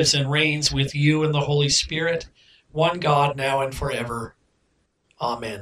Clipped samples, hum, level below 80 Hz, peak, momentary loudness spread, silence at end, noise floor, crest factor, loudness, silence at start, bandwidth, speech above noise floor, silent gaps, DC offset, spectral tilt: under 0.1%; none; -46 dBFS; -4 dBFS; 11 LU; 0 s; -68 dBFS; 18 dB; -22 LUFS; 0 s; 14.5 kHz; 46 dB; none; under 0.1%; -4 dB/octave